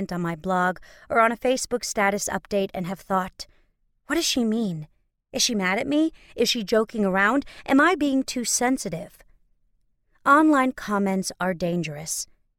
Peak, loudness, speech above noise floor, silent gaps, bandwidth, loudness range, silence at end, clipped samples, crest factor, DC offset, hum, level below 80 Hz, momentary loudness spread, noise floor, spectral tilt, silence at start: -4 dBFS; -23 LUFS; 43 dB; none; 17.5 kHz; 4 LU; 0.35 s; under 0.1%; 20 dB; under 0.1%; none; -54 dBFS; 11 LU; -66 dBFS; -3.5 dB/octave; 0 s